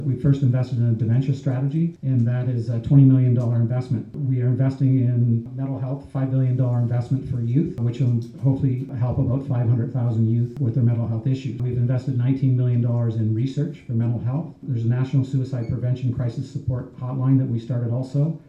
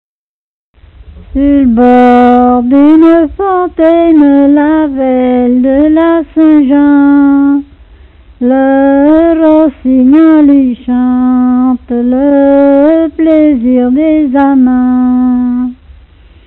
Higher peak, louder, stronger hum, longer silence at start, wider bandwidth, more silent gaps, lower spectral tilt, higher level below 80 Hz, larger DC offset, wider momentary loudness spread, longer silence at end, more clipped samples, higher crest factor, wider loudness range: second, -4 dBFS vs 0 dBFS; second, -22 LUFS vs -7 LUFS; neither; second, 0 s vs 1.15 s; first, 6.8 kHz vs 4.1 kHz; neither; first, -10.5 dB/octave vs -9 dB/octave; second, -50 dBFS vs -34 dBFS; neither; about the same, 7 LU vs 7 LU; second, 0.1 s vs 0.7 s; second, under 0.1% vs 0.8%; first, 16 dB vs 6 dB; about the same, 4 LU vs 2 LU